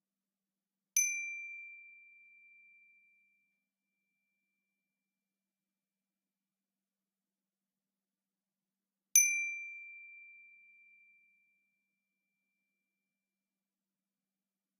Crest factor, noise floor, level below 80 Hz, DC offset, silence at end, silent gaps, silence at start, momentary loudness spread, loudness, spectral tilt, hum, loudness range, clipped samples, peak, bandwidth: 32 dB; under -90 dBFS; under -90 dBFS; under 0.1%; 4.45 s; none; 0.95 s; 27 LU; -31 LUFS; 5.5 dB/octave; none; 17 LU; under 0.1%; -10 dBFS; 10 kHz